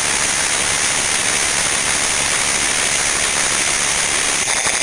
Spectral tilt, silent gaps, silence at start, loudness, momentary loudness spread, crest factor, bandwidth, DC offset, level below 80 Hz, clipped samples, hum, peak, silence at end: 0 dB/octave; none; 0 s; -14 LUFS; 0 LU; 18 dB; 12 kHz; under 0.1%; -42 dBFS; under 0.1%; none; 0 dBFS; 0 s